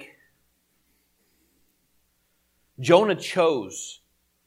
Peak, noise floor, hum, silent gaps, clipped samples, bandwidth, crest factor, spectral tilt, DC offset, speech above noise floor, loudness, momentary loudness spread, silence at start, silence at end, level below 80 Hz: -2 dBFS; -69 dBFS; none; none; under 0.1%; 15.5 kHz; 24 dB; -4.5 dB/octave; under 0.1%; 48 dB; -22 LUFS; 19 LU; 0 s; 0.55 s; -74 dBFS